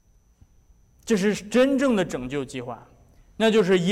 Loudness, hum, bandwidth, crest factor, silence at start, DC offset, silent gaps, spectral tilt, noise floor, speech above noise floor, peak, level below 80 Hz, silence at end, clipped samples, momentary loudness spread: -23 LUFS; none; 15.5 kHz; 12 dB; 1.05 s; under 0.1%; none; -5.5 dB/octave; -57 dBFS; 35 dB; -12 dBFS; -54 dBFS; 0 s; under 0.1%; 17 LU